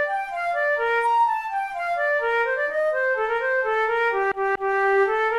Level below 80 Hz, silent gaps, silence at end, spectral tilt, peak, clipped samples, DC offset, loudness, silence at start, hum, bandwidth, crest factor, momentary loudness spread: -58 dBFS; none; 0 s; -3.5 dB/octave; -12 dBFS; under 0.1%; under 0.1%; -22 LUFS; 0 s; none; 12.5 kHz; 10 dB; 6 LU